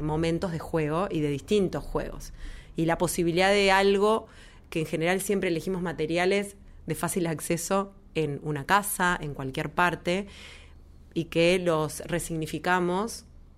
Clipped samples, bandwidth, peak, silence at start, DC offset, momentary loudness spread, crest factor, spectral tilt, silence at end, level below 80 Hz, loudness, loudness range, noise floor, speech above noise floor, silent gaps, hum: under 0.1%; 16 kHz; -8 dBFS; 0 s; under 0.1%; 13 LU; 20 dB; -4.5 dB/octave; 0.35 s; -46 dBFS; -27 LUFS; 3 LU; -50 dBFS; 23 dB; none; none